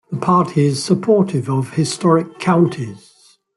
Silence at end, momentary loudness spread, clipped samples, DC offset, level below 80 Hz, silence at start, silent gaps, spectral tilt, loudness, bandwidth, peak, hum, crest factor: 0.6 s; 5 LU; under 0.1%; under 0.1%; -56 dBFS; 0.1 s; none; -6.5 dB/octave; -16 LUFS; 12 kHz; -2 dBFS; none; 16 dB